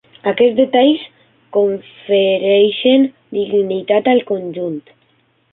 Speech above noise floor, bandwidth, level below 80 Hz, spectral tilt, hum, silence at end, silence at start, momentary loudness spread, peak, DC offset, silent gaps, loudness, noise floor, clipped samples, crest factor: 44 dB; 4.1 kHz; -64 dBFS; -10 dB/octave; none; 0.75 s; 0.25 s; 11 LU; -2 dBFS; under 0.1%; none; -15 LUFS; -58 dBFS; under 0.1%; 14 dB